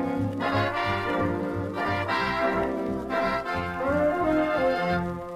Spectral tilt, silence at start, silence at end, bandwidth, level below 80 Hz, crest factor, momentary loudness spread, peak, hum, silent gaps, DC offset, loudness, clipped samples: -7 dB/octave; 0 s; 0 s; 15 kHz; -48 dBFS; 14 dB; 5 LU; -14 dBFS; none; none; under 0.1%; -26 LUFS; under 0.1%